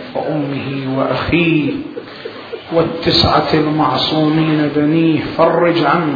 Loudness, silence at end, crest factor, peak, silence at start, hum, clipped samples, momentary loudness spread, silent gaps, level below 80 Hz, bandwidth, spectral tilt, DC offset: -14 LUFS; 0 s; 14 dB; 0 dBFS; 0 s; none; under 0.1%; 14 LU; none; -40 dBFS; 5 kHz; -7.5 dB/octave; under 0.1%